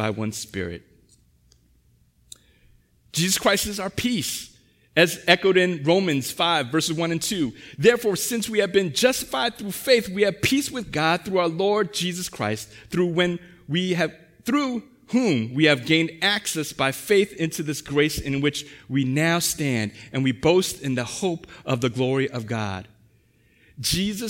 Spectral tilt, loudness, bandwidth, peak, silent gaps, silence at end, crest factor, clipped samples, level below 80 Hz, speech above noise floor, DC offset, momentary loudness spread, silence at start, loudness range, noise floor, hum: -4 dB/octave; -23 LUFS; 16.5 kHz; -2 dBFS; none; 0 s; 22 dB; under 0.1%; -52 dBFS; 38 dB; under 0.1%; 9 LU; 0 s; 5 LU; -60 dBFS; none